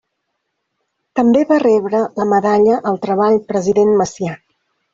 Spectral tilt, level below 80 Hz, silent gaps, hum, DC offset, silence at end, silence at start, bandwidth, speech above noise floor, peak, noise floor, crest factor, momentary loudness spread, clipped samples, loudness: -6.5 dB/octave; -56 dBFS; none; none; under 0.1%; 0.55 s; 1.15 s; 7.6 kHz; 59 dB; -2 dBFS; -73 dBFS; 12 dB; 10 LU; under 0.1%; -15 LUFS